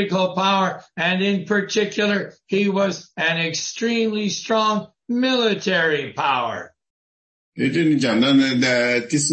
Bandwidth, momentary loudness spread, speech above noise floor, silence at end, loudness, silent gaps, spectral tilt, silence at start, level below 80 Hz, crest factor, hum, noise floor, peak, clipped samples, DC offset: 8.8 kHz; 6 LU; over 70 dB; 0 s; -20 LUFS; 6.90-7.52 s; -4 dB/octave; 0 s; -66 dBFS; 14 dB; none; under -90 dBFS; -6 dBFS; under 0.1%; under 0.1%